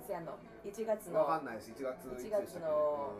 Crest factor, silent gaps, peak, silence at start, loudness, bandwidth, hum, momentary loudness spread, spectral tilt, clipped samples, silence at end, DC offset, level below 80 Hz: 16 dB; none; -22 dBFS; 0 s; -37 LUFS; 15.5 kHz; none; 13 LU; -5.5 dB/octave; under 0.1%; 0 s; under 0.1%; -68 dBFS